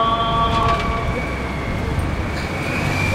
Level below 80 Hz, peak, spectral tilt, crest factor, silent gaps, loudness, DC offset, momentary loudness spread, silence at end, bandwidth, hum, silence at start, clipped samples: -28 dBFS; -6 dBFS; -5.5 dB/octave; 14 dB; none; -21 LUFS; under 0.1%; 6 LU; 0 s; 16 kHz; none; 0 s; under 0.1%